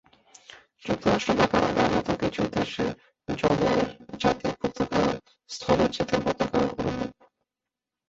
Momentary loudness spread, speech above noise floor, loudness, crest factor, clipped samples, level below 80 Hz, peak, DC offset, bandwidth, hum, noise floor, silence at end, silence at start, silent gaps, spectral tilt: 11 LU; 64 dB; -26 LUFS; 20 dB; under 0.1%; -48 dBFS; -6 dBFS; under 0.1%; 8 kHz; none; -89 dBFS; 1 s; 0.5 s; none; -5.5 dB/octave